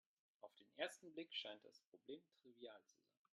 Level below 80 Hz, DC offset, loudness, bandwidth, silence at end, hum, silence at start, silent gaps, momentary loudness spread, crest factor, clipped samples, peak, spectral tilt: under -90 dBFS; under 0.1%; -54 LUFS; 11.5 kHz; 0.5 s; none; 0.45 s; 1.87-1.92 s; 16 LU; 26 dB; under 0.1%; -30 dBFS; -2 dB/octave